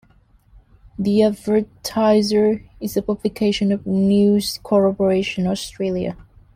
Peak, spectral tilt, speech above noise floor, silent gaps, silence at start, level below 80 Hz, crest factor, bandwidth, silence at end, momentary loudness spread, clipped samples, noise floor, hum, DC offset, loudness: -4 dBFS; -6 dB/octave; 36 dB; none; 1 s; -48 dBFS; 14 dB; 16 kHz; 0.35 s; 10 LU; under 0.1%; -54 dBFS; none; under 0.1%; -19 LUFS